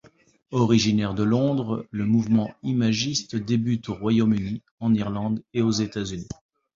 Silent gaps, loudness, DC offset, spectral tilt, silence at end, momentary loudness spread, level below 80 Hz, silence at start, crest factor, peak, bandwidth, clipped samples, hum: 4.71-4.78 s; -24 LUFS; under 0.1%; -6 dB/octave; 0.45 s; 9 LU; -52 dBFS; 0.5 s; 16 dB; -6 dBFS; 7.6 kHz; under 0.1%; none